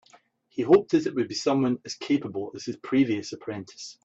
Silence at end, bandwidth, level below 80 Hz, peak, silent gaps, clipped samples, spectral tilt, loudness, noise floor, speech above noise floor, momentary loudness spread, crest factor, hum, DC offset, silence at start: 0.15 s; 8 kHz; -68 dBFS; -6 dBFS; none; under 0.1%; -5.5 dB/octave; -26 LUFS; -59 dBFS; 34 dB; 16 LU; 20 dB; none; under 0.1%; 0.55 s